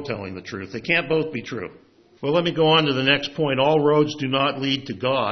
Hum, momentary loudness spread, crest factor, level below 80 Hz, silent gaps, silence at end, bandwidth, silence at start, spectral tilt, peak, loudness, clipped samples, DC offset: none; 15 LU; 20 dB; -62 dBFS; none; 0 s; 6.4 kHz; 0 s; -6 dB/octave; -2 dBFS; -21 LUFS; under 0.1%; under 0.1%